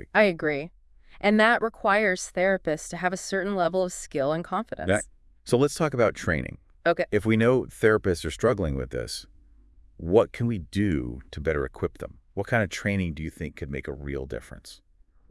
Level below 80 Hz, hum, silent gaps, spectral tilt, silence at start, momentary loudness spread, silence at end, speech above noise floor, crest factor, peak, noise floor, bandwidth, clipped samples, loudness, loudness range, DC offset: -46 dBFS; none; none; -5.5 dB/octave; 0 s; 14 LU; 0.55 s; 29 dB; 20 dB; -6 dBFS; -54 dBFS; 12 kHz; under 0.1%; -26 LUFS; 6 LU; under 0.1%